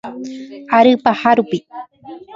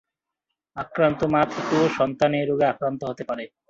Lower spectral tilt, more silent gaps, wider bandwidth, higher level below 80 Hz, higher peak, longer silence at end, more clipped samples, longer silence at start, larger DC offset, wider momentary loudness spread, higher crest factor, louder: about the same, -6 dB/octave vs -6.5 dB/octave; neither; about the same, 7.6 kHz vs 7.8 kHz; about the same, -60 dBFS vs -58 dBFS; first, 0 dBFS vs -6 dBFS; second, 0 s vs 0.25 s; neither; second, 0.05 s vs 0.75 s; neither; first, 22 LU vs 11 LU; about the same, 16 dB vs 18 dB; first, -14 LUFS vs -23 LUFS